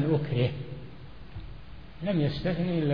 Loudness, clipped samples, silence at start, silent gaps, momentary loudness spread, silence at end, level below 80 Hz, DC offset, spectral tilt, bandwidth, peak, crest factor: -29 LUFS; under 0.1%; 0 s; none; 20 LU; 0 s; -48 dBFS; 0.5%; -9.5 dB/octave; 5.2 kHz; -14 dBFS; 14 dB